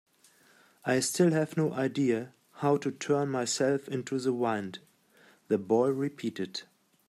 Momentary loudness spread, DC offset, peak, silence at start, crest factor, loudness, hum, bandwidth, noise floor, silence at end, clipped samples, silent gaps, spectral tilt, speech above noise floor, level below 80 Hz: 12 LU; under 0.1%; -14 dBFS; 0.85 s; 18 dB; -30 LUFS; none; 15 kHz; -63 dBFS; 0.45 s; under 0.1%; none; -5 dB/octave; 34 dB; -76 dBFS